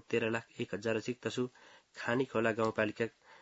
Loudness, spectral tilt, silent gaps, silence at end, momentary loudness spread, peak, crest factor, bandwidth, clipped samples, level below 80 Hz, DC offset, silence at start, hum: -35 LUFS; -4.5 dB/octave; none; 0.05 s; 9 LU; -16 dBFS; 20 dB; 7.6 kHz; under 0.1%; -74 dBFS; under 0.1%; 0.1 s; none